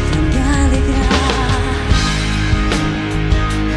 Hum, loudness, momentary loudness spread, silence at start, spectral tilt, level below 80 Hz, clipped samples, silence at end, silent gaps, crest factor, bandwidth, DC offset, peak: none; -16 LUFS; 3 LU; 0 s; -5.5 dB/octave; -18 dBFS; under 0.1%; 0 s; none; 12 dB; 11.5 kHz; under 0.1%; -2 dBFS